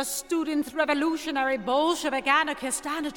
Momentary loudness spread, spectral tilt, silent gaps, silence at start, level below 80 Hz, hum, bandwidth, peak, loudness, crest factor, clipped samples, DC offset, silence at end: 6 LU; -2 dB/octave; none; 0 s; -58 dBFS; none; 18.5 kHz; -8 dBFS; -26 LUFS; 18 dB; under 0.1%; under 0.1%; 0 s